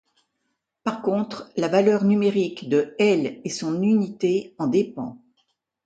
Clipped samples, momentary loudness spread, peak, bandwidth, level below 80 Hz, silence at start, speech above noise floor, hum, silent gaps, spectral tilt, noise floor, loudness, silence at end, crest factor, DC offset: under 0.1%; 10 LU; -6 dBFS; 9 kHz; -68 dBFS; 0.85 s; 55 dB; none; none; -6.5 dB/octave; -77 dBFS; -23 LUFS; 0.7 s; 18 dB; under 0.1%